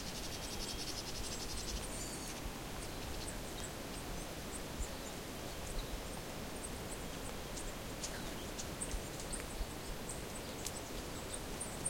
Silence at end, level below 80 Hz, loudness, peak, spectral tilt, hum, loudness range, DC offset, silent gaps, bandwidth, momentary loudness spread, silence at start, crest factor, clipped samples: 0 s; -50 dBFS; -44 LUFS; -22 dBFS; -3 dB/octave; none; 2 LU; under 0.1%; none; 16.5 kHz; 3 LU; 0 s; 22 dB; under 0.1%